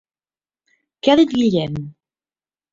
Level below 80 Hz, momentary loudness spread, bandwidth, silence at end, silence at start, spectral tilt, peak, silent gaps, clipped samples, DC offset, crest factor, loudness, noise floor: -54 dBFS; 16 LU; 7.6 kHz; 0.8 s; 1.05 s; -6.5 dB/octave; -2 dBFS; none; under 0.1%; under 0.1%; 20 dB; -17 LUFS; under -90 dBFS